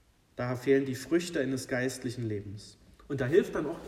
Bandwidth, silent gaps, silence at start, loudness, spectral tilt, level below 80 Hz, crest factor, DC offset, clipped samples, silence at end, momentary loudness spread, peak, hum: 15.5 kHz; none; 0.35 s; -31 LUFS; -6 dB/octave; -60 dBFS; 20 dB; under 0.1%; under 0.1%; 0 s; 12 LU; -12 dBFS; none